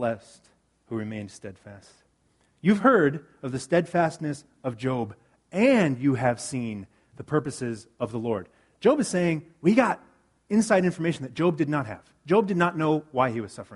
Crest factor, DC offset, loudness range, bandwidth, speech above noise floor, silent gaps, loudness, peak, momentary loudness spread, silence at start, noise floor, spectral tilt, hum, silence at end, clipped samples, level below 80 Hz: 20 dB; under 0.1%; 3 LU; 11.5 kHz; 42 dB; none; -25 LUFS; -6 dBFS; 14 LU; 0 s; -67 dBFS; -6.5 dB/octave; none; 0 s; under 0.1%; -64 dBFS